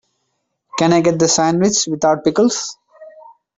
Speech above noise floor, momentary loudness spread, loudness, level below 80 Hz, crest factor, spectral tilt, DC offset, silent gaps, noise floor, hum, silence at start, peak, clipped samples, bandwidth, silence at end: 56 dB; 9 LU; -15 LUFS; -56 dBFS; 16 dB; -4 dB/octave; under 0.1%; none; -71 dBFS; none; 0.75 s; -2 dBFS; under 0.1%; 8 kHz; 0.5 s